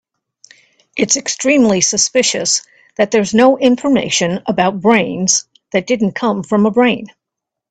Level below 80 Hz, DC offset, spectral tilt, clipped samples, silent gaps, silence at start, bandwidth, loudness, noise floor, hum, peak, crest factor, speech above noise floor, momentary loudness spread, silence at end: -54 dBFS; under 0.1%; -3 dB/octave; under 0.1%; none; 0.95 s; 9.4 kHz; -14 LUFS; -81 dBFS; none; 0 dBFS; 14 dB; 68 dB; 8 LU; 0.65 s